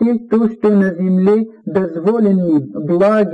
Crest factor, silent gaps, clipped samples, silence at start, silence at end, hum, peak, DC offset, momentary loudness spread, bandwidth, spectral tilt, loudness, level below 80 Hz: 8 dB; none; under 0.1%; 0 s; 0 s; none; -6 dBFS; under 0.1%; 6 LU; 5.6 kHz; -10 dB/octave; -15 LUFS; -56 dBFS